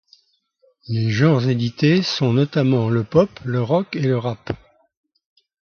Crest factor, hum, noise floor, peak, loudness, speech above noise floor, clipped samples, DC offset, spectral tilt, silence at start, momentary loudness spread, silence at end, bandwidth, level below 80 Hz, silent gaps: 18 dB; none; -63 dBFS; -2 dBFS; -19 LUFS; 44 dB; under 0.1%; under 0.1%; -7.5 dB/octave; 0.9 s; 10 LU; 1.15 s; 6.8 kHz; -52 dBFS; none